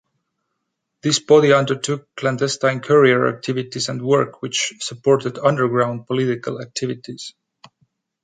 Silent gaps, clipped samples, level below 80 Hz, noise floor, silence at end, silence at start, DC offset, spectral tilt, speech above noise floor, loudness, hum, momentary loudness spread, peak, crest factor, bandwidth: none; under 0.1%; -64 dBFS; -76 dBFS; 0.95 s; 1.05 s; under 0.1%; -4.5 dB/octave; 58 dB; -19 LUFS; none; 12 LU; -2 dBFS; 18 dB; 9.4 kHz